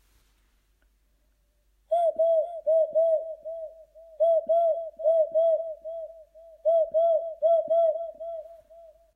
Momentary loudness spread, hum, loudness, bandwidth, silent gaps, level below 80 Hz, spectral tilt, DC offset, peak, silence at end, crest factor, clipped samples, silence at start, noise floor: 16 LU; none; -25 LUFS; 3.6 kHz; none; -68 dBFS; -5.5 dB/octave; under 0.1%; -14 dBFS; 0.3 s; 12 dB; under 0.1%; 1.9 s; -68 dBFS